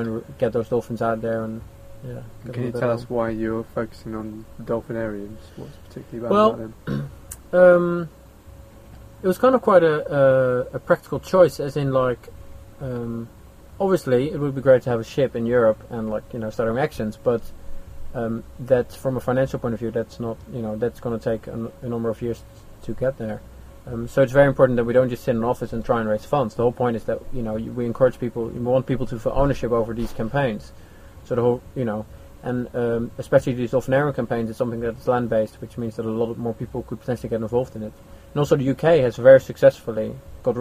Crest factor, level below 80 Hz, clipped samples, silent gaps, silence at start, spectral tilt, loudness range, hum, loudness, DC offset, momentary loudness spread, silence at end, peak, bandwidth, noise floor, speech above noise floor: 20 dB; -42 dBFS; under 0.1%; none; 0 s; -7.5 dB/octave; 8 LU; none; -22 LUFS; under 0.1%; 15 LU; 0 s; -2 dBFS; 15 kHz; -44 dBFS; 23 dB